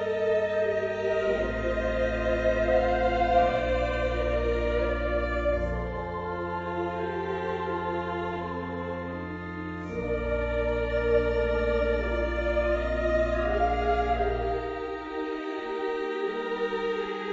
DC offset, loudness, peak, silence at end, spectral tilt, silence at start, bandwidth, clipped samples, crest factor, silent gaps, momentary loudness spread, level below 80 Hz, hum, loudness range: under 0.1%; -28 LUFS; -12 dBFS; 0 s; -7 dB/octave; 0 s; 7.6 kHz; under 0.1%; 16 dB; none; 8 LU; -36 dBFS; none; 6 LU